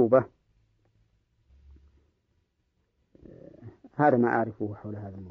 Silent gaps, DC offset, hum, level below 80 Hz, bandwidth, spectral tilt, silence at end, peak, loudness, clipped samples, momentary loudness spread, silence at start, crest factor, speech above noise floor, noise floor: none; under 0.1%; none; -64 dBFS; 5.6 kHz; -8.5 dB/octave; 0 s; -8 dBFS; -26 LUFS; under 0.1%; 26 LU; 0 s; 22 dB; 49 dB; -74 dBFS